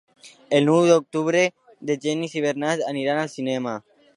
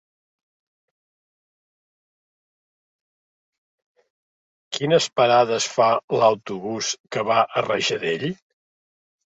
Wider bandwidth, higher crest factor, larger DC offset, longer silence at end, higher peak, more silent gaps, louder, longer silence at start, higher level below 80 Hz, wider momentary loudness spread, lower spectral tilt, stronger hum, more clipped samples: first, 11.5 kHz vs 8.4 kHz; about the same, 18 dB vs 20 dB; neither; second, 0.4 s vs 1 s; about the same, -4 dBFS vs -4 dBFS; second, none vs 6.04-6.08 s, 7.00-7.04 s; about the same, -22 LUFS vs -21 LUFS; second, 0.25 s vs 4.7 s; second, -76 dBFS vs -68 dBFS; about the same, 11 LU vs 10 LU; first, -5 dB/octave vs -3.5 dB/octave; neither; neither